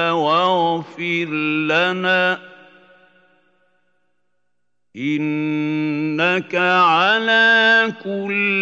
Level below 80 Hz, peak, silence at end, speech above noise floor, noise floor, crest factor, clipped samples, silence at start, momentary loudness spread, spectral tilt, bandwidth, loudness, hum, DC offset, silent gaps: -76 dBFS; -4 dBFS; 0 s; 60 dB; -78 dBFS; 16 dB; under 0.1%; 0 s; 9 LU; -5.5 dB/octave; 7.8 kHz; -17 LUFS; 60 Hz at -60 dBFS; under 0.1%; none